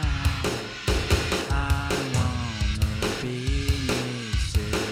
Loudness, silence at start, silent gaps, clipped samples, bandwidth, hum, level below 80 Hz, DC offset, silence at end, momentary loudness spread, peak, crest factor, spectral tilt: -26 LUFS; 0 s; none; under 0.1%; 16.5 kHz; none; -30 dBFS; under 0.1%; 0 s; 4 LU; -8 dBFS; 16 dB; -4.5 dB/octave